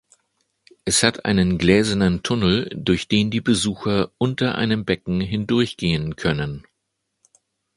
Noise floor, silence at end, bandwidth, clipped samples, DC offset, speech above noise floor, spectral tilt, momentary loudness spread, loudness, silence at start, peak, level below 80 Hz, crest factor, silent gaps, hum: -76 dBFS; 1.15 s; 11.5 kHz; under 0.1%; under 0.1%; 56 dB; -4.5 dB/octave; 6 LU; -20 LUFS; 0.85 s; 0 dBFS; -42 dBFS; 20 dB; none; none